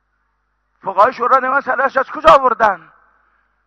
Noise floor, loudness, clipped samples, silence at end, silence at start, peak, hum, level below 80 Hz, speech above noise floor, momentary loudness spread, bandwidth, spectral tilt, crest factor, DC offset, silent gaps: -66 dBFS; -13 LUFS; under 0.1%; 0.9 s; 0.85 s; 0 dBFS; 50 Hz at -60 dBFS; -46 dBFS; 53 dB; 11 LU; 10 kHz; -4.5 dB/octave; 16 dB; under 0.1%; none